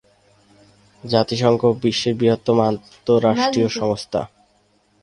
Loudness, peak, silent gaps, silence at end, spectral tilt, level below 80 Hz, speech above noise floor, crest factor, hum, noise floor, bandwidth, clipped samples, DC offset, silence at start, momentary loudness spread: -19 LUFS; -2 dBFS; none; 0.75 s; -6 dB/octave; -54 dBFS; 42 dB; 18 dB; none; -60 dBFS; 11 kHz; under 0.1%; under 0.1%; 1.05 s; 10 LU